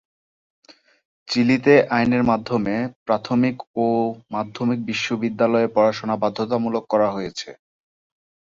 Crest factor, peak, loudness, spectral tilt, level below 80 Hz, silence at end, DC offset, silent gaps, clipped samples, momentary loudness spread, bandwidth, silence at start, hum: 18 dB; -2 dBFS; -21 LUFS; -6 dB/octave; -58 dBFS; 1 s; under 0.1%; 2.96-3.06 s, 3.67-3.74 s; under 0.1%; 10 LU; 7.6 kHz; 1.25 s; none